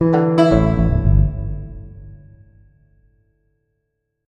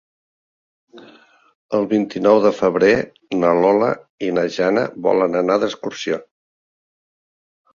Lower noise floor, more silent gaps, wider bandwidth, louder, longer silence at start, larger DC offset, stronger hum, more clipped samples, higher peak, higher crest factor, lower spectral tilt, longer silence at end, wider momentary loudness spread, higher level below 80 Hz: first, -74 dBFS vs -49 dBFS; second, none vs 1.55-1.69 s, 4.10-4.18 s; first, 8.6 kHz vs 7.4 kHz; about the same, -16 LUFS vs -18 LUFS; second, 0 s vs 0.95 s; neither; neither; neither; about the same, 0 dBFS vs -2 dBFS; about the same, 18 dB vs 18 dB; first, -9 dB/octave vs -6 dB/octave; first, 2.1 s vs 1.5 s; first, 22 LU vs 10 LU; first, -26 dBFS vs -58 dBFS